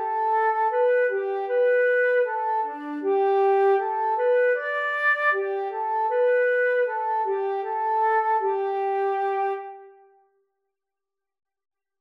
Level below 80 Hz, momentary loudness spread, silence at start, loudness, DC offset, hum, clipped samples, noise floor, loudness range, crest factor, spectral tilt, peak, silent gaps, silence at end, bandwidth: under -90 dBFS; 6 LU; 0 s; -23 LUFS; under 0.1%; none; under 0.1%; -88 dBFS; 5 LU; 12 dB; -3 dB/octave; -12 dBFS; none; 2.1 s; 5.4 kHz